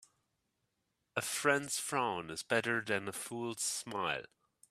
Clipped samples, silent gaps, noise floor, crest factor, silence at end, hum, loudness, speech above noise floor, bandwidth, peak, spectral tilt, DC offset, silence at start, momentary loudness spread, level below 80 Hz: under 0.1%; none; -83 dBFS; 24 dB; 0.45 s; none; -36 LUFS; 47 dB; 15.5 kHz; -14 dBFS; -2.5 dB/octave; under 0.1%; 1.15 s; 9 LU; -78 dBFS